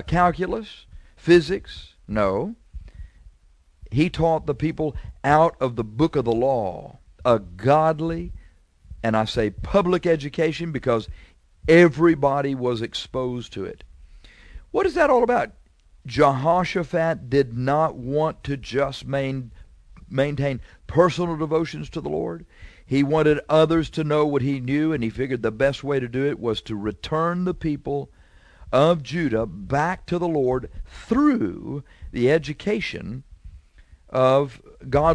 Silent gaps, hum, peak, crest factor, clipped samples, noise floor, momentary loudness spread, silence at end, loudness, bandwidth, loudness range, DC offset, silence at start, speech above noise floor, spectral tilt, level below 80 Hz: none; none; -2 dBFS; 20 dB; under 0.1%; -56 dBFS; 13 LU; 0 s; -22 LUFS; 10.5 kHz; 4 LU; under 0.1%; 0 s; 34 dB; -7 dB/octave; -42 dBFS